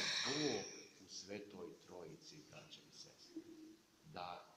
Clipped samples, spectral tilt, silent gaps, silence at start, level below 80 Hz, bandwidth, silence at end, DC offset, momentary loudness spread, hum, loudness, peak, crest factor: under 0.1%; -2.5 dB/octave; none; 0 s; -84 dBFS; 15.5 kHz; 0 s; under 0.1%; 19 LU; none; -47 LUFS; -28 dBFS; 22 dB